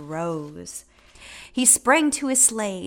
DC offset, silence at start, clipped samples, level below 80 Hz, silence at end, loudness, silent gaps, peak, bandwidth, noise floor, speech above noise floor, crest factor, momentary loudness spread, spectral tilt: under 0.1%; 0 s; under 0.1%; -58 dBFS; 0 s; -18 LUFS; none; -2 dBFS; 18 kHz; -44 dBFS; 22 dB; 20 dB; 20 LU; -2 dB/octave